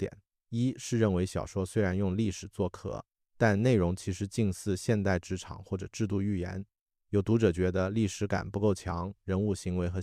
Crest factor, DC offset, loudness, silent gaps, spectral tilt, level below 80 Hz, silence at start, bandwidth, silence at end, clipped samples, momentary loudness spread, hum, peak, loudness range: 18 dB; under 0.1%; -31 LUFS; 6.81-6.86 s; -6.5 dB/octave; -52 dBFS; 0 s; 14 kHz; 0 s; under 0.1%; 12 LU; none; -12 dBFS; 2 LU